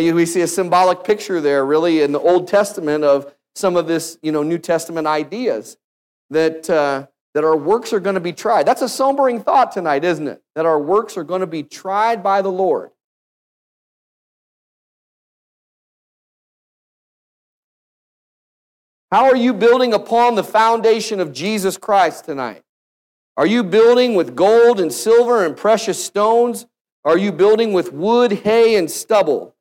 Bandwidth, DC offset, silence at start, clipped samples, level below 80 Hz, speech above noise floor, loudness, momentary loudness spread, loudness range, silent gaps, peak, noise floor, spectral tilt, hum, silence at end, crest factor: 16.5 kHz; under 0.1%; 0 s; under 0.1%; -66 dBFS; over 75 dB; -16 LUFS; 9 LU; 6 LU; 5.84-6.29 s, 7.21-7.33 s, 13.04-19.08 s, 22.69-23.35 s, 26.81-26.85 s, 26.92-27.03 s; -2 dBFS; under -90 dBFS; -4.5 dB/octave; none; 0.15 s; 14 dB